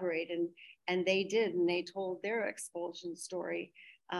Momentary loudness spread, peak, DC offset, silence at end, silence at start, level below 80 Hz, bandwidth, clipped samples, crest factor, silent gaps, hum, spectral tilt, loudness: 11 LU; -16 dBFS; under 0.1%; 0 s; 0 s; -86 dBFS; 12.5 kHz; under 0.1%; 18 dB; none; none; -4 dB/octave; -36 LUFS